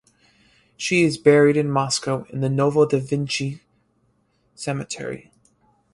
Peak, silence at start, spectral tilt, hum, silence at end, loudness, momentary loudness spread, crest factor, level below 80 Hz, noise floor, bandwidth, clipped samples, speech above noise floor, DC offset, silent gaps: -2 dBFS; 0.8 s; -5 dB/octave; none; 0.75 s; -21 LUFS; 15 LU; 20 dB; -60 dBFS; -65 dBFS; 11.5 kHz; under 0.1%; 45 dB; under 0.1%; none